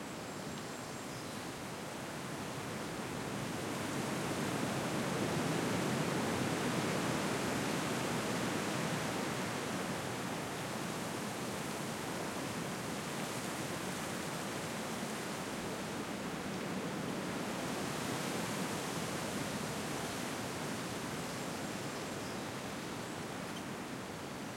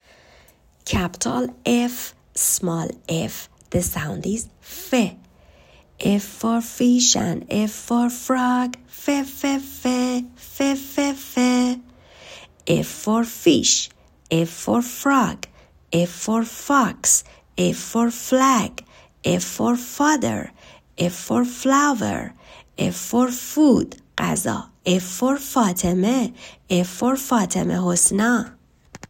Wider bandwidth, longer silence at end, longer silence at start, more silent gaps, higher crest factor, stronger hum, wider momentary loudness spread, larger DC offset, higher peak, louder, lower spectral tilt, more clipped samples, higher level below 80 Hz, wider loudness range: about the same, 16.5 kHz vs 16.5 kHz; about the same, 0 s vs 0.1 s; second, 0 s vs 0.85 s; neither; about the same, 16 dB vs 20 dB; neither; second, 8 LU vs 12 LU; neither; second, -22 dBFS vs -2 dBFS; second, -38 LUFS vs -21 LUFS; about the same, -4 dB/octave vs -4 dB/octave; neither; second, -66 dBFS vs -50 dBFS; about the same, 5 LU vs 3 LU